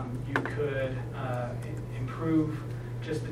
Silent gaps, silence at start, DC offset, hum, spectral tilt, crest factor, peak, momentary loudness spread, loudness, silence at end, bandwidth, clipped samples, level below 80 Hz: none; 0 s; under 0.1%; none; -7.5 dB/octave; 20 dB; -12 dBFS; 9 LU; -32 LUFS; 0 s; 13 kHz; under 0.1%; -50 dBFS